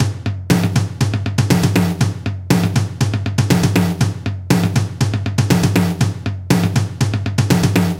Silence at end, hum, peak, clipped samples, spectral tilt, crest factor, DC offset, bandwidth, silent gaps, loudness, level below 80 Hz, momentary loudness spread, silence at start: 0 s; none; 0 dBFS; under 0.1%; -6 dB/octave; 16 dB; under 0.1%; 17 kHz; none; -17 LUFS; -38 dBFS; 5 LU; 0 s